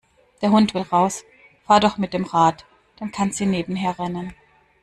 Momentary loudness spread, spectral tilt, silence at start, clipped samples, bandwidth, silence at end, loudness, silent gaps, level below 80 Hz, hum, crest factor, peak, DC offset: 15 LU; -5.5 dB/octave; 0.4 s; under 0.1%; 12.5 kHz; 0.5 s; -20 LUFS; none; -54 dBFS; none; 18 dB; -2 dBFS; under 0.1%